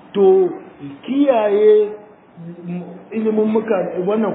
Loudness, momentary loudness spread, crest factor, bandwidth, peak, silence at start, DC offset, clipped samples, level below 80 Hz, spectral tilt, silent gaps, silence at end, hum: -16 LUFS; 20 LU; 14 dB; 3.9 kHz; -2 dBFS; 0.15 s; under 0.1%; under 0.1%; -68 dBFS; -6.5 dB/octave; none; 0 s; none